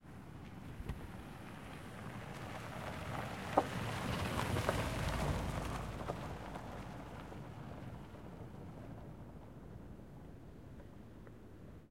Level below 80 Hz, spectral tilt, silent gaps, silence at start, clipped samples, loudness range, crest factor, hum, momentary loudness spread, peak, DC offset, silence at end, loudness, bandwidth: -54 dBFS; -5.5 dB/octave; none; 0 s; under 0.1%; 14 LU; 30 dB; none; 18 LU; -12 dBFS; under 0.1%; 0 s; -43 LUFS; 16.5 kHz